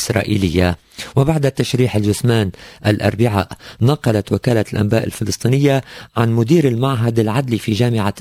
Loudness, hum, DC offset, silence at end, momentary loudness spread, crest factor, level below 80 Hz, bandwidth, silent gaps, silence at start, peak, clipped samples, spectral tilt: -17 LUFS; none; under 0.1%; 0 s; 6 LU; 16 dB; -36 dBFS; 16 kHz; none; 0 s; 0 dBFS; under 0.1%; -6.5 dB/octave